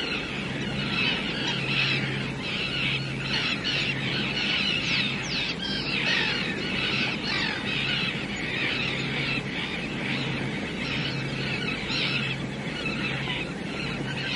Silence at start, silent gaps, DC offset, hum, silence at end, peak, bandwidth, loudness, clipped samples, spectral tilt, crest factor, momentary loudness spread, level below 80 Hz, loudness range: 0 s; none; under 0.1%; none; 0 s; -12 dBFS; 11.5 kHz; -26 LUFS; under 0.1%; -4.5 dB/octave; 16 dB; 6 LU; -50 dBFS; 3 LU